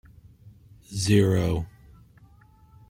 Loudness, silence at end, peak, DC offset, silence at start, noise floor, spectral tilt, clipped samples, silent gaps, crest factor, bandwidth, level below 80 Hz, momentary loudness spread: -24 LUFS; 1.2 s; -8 dBFS; under 0.1%; 0.45 s; -55 dBFS; -6 dB/octave; under 0.1%; none; 20 dB; 16 kHz; -48 dBFS; 17 LU